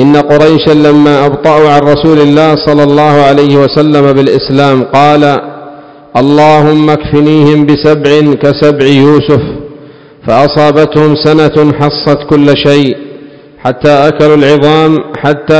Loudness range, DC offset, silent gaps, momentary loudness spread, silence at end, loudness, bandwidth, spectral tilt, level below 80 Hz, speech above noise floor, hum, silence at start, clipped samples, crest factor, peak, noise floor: 2 LU; 1%; none; 6 LU; 0 s; -6 LUFS; 8 kHz; -7.5 dB/octave; -36 dBFS; 27 dB; none; 0 s; 10%; 6 dB; 0 dBFS; -32 dBFS